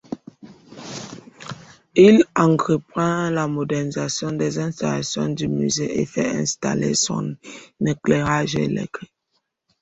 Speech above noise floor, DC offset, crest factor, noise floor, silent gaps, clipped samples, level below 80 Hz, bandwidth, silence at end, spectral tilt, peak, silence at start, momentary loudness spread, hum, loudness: 52 dB; under 0.1%; 20 dB; -72 dBFS; none; under 0.1%; -54 dBFS; 8.4 kHz; 0.75 s; -5 dB/octave; -2 dBFS; 0.1 s; 21 LU; none; -20 LUFS